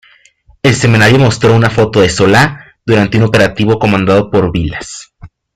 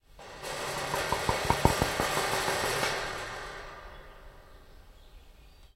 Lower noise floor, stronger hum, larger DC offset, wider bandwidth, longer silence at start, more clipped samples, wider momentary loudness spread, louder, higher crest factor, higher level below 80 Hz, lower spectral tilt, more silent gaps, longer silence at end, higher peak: second, -47 dBFS vs -54 dBFS; neither; neither; second, 14.5 kHz vs 16 kHz; first, 0.65 s vs 0.15 s; neither; second, 11 LU vs 20 LU; first, -10 LUFS vs -30 LUFS; second, 10 dB vs 30 dB; first, -36 dBFS vs -46 dBFS; first, -5.5 dB/octave vs -3.5 dB/octave; neither; first, 0.3 s vs 0.1 s; first, 0 dBFS vs -4 dBFS